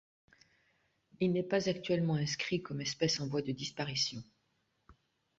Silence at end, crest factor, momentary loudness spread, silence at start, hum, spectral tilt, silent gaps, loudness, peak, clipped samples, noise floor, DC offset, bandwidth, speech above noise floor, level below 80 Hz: 0.45 s; 18 dB; 6 LU; 1.2 s; none; -4.5 dB/octave; none; -34 LUFS; -18 dBFS; under 0.1%; -78 dBFS; under 0.1%; 8 kHz; 44 dB; -70 dBFS